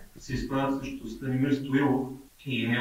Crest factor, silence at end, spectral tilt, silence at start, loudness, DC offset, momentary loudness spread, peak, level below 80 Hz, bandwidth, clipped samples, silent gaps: 16 dB; 0 s; -6.5 dB/octave; 0 s; -29 LUFS; under 0.1%; 11 LU; -14 dBFS; -48 dBFS; 16 kHz; under 0.1%; none